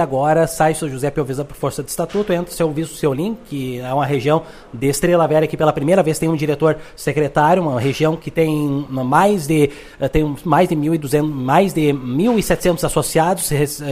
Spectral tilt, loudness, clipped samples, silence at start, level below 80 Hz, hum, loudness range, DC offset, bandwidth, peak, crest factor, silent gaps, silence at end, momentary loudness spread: -6 dB/octave; -17 LUFS; under 0.1%; 0 s; -38 dBFS; none; 4 LU; under 0.1%; 16 kHz; 0 dBFS; 16 dB; none; 0 s; 8 LU